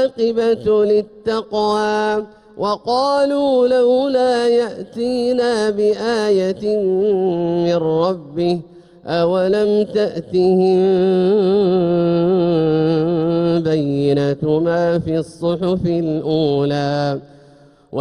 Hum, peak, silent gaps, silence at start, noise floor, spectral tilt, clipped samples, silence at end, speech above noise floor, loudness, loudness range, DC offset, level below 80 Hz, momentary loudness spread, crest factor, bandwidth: none; -6 dBFS; none; 0 s; -47 dBFS; -7 dB/octave; under 0.1%; 0 s; 31 dB; -17 LUFS; 3 LU; under 0.1%; -52 dBFS; 7 LU; 10 dB; 11.5 kHz